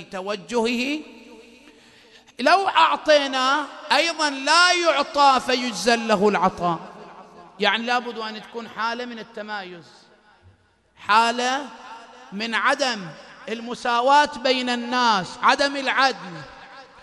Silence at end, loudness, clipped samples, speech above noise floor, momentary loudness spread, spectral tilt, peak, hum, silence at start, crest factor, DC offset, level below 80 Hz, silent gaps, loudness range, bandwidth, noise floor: 0.2 s; -20 LUFS; under 0.1%; 37 dB; 18 LU; -2.5 dB/octave; -2 dBFS; none; 0 s; 20 dB; under 0.1%; -62 dBFS; none; 8 LU; 12.5 kHz; -58 dBFS